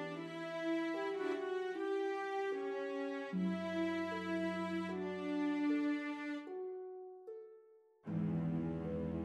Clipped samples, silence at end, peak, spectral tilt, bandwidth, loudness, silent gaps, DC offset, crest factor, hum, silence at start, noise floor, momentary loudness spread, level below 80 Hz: under 0.1%; 0 s; -28 dBFS; -7.5 dB/octave; 10.5 kHz; -40 LUFS; none; under 0.1%; 12 dB; none; 0 s; -65 dBFS; 10 LU; -68 dBFS